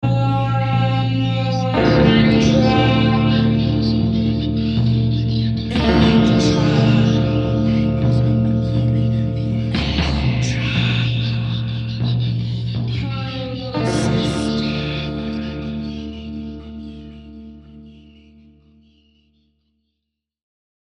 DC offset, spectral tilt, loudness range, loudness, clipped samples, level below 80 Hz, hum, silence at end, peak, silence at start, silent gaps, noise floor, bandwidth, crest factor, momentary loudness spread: under 0.1%; -7 dB/octave; 12 LU; -18 LUFS; under 0.1%; -32 dBFS; none; 2.95 s; -2 dBFS; 0 s; none; -78 dBFS; 10 kHz; 16 dB; 12 LU